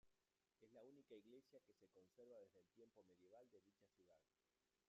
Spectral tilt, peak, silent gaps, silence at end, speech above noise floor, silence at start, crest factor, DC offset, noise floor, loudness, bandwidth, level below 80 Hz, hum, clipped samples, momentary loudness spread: -5 dB/octave; -52 dBFS; none; 0 s; over 19 dB; 0.05 s; 18 dB; under 0.1%; under -90 dBFS; -68 LUFS; 7.2 kHz; under -90 dBFS; none; under 0.1%; 3 LU